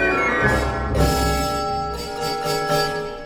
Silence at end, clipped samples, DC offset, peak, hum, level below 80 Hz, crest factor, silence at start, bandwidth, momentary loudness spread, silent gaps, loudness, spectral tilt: 0 s; under 0.1%; under 0.1%; -6 dBFS; none; -30 dBFS; 16 dB; 0 s; over 20 kHz; 7 LU; none; -21 LUFS; -4.5 dB/octave